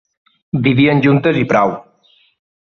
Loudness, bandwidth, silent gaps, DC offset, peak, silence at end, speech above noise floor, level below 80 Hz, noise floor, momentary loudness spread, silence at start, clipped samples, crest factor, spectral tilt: -14 LUFS; 6.8 kHz; none; under 0.1%; -2 dBFS; 0.8 s; 42 dB; -50 dBFS; -54 dBFS; 9 LU; 0.55 s; under 0.1%; 14 dB; -8 dB/octave